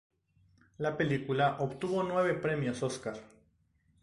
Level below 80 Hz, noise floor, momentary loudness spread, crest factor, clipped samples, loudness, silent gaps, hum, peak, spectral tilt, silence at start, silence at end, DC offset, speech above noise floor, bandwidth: -64 dBFS; -71 dBFS; 8 LU; 18 dB; under 0.1%; -32 LUFS; none; none; -16 dBFS; -6 dB/octave; 0.8 s; 0.75 s; under 0.1%; 39 dB; 11.5 kHz